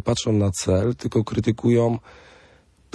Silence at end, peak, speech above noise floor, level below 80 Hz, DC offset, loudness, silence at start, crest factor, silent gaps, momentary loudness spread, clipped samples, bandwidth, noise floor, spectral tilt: 0.95 s; -8 dBFS; 34 dB; -48 dBFS; under 0.1%; -22 LUFS; 0.05 s; 16 dB; none; 5 LU; under 0.1%; 11 kHz; -55 dBFS; -6 dB/octave